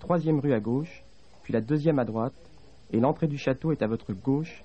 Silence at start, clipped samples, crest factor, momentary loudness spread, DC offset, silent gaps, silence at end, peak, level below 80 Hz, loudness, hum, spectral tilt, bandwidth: 0 s; under 0.1%; 18 dB; 7 LU; 0.3%; none; 0.05 s; -10 dBFS; -58 dBFS; -28 LUFS; none; -9 dB/octave; 8.2 kHz